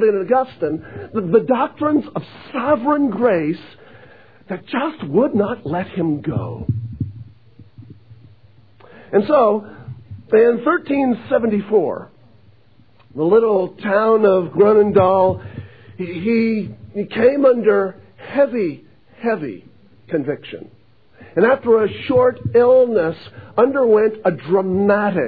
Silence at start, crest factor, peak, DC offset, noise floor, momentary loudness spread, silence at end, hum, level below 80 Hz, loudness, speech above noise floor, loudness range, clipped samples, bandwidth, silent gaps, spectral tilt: 0 s; 16 dB; -2 dBFS; 0.3%; -53 dBFS; 16 LU; 0 s; none; -54 dBFS; -17 LUFS; 36 dB; 7 LU; under 0.1%; 4.9 kHz; none; -10.5 dB/octave